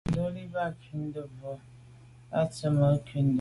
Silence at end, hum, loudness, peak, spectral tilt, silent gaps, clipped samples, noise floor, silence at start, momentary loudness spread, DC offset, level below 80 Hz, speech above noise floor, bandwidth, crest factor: 0 s; none; -30 LUFS; -12 dBFS; -8 dB/octave; none; under 0.1%; -52 dBFS; 0.05 s; 16 LU; under 0.1%; -54 dBFS; 24 dB; 11.5 kHz; 18 dB